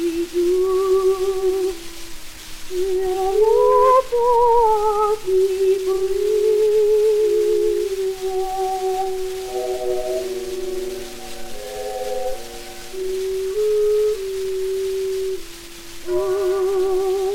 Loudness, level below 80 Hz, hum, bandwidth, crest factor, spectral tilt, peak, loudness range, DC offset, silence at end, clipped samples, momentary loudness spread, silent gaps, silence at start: -20 LUFS; -40 dBFS; none; 17 kHz; 16 dB; -4 dB/octave; -4 dBFS; 10 LU; under 0.1%; 0 s; under 0.1%; 17 LU; none; 0 s